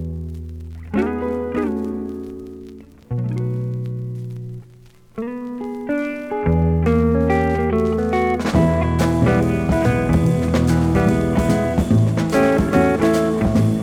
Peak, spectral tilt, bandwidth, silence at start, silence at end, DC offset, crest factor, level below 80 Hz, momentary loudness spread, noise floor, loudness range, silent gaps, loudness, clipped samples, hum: -4 dBFS; -7.5 dB/octave; 16 kHz; 0 s; 0 s; under 0.1%; 16 dB; -34 dBFS; 15 LU; -46 dBFS; 10 LU; none; -19 LUFS; under 0.1%; none